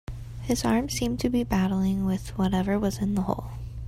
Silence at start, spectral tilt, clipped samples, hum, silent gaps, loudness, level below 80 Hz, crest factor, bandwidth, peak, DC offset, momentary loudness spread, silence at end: 0.1 s; -6 dB/octave; under 0.1%; none; none; -26 LUFS; -40 dBFS; 16 dB; 16 kHz; -10 dBFS; under 0.1%; 7 LU; 0 s